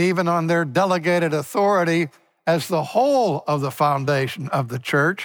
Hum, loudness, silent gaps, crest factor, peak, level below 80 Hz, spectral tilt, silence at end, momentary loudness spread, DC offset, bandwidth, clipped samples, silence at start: none; -21 LUFS; none; 16 dB; -4 dBFS; -68 dBFS; -6 dB/octave; 0 s; 6 LU; under 0.1%; over 20 kHz; under 0.1%; 0 s